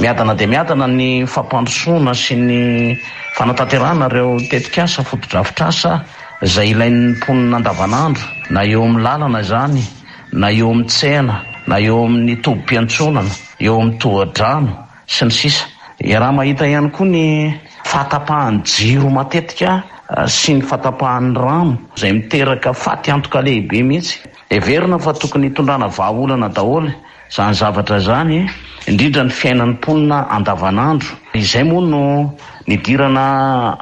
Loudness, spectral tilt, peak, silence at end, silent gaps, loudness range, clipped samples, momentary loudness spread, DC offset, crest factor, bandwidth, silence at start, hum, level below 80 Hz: -14 LUFS; -5.5 dB/octave; 0 dBFS; 0 s; none; 1 LU; under 0.1%; 6 LU; under 0.1%; 12 dB; 8.8 kHz; 0 s; none; -42 dBFS